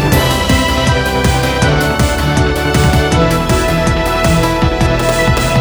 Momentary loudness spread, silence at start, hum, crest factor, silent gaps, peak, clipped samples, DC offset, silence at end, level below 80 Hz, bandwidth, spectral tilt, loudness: 2 LU; 0 s; none; 12 dB; none; 0 dBFS; under 0.1%; under 0.1%; 0 s; -20 dBFS; over 20 kHz; -5 dB/octave; -12 LUFS